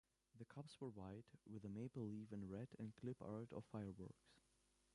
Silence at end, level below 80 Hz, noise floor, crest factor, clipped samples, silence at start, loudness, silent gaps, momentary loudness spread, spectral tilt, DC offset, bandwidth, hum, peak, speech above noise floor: 0.55 s; -78 dBFS; -82 dBFS; 16 dB; under 0.1%; 0.35 s; -55 LUFS; none; 9 LU; -8 dB/octave; under 0.1%; 11 kHz; none; -38 dBFS; 28 dB